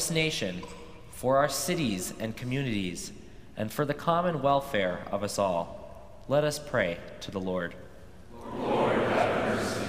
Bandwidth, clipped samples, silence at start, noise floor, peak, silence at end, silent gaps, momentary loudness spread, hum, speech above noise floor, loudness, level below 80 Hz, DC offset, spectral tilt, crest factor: 16 kHz; under 0.1%; 0 s; -50 dBFS; -10 dBFS; 0 s; none; 19 LU; none; 20 dB; -29 LUFS; -54 dBFS; 0.3%; -4.5 dB/octave; 20 dB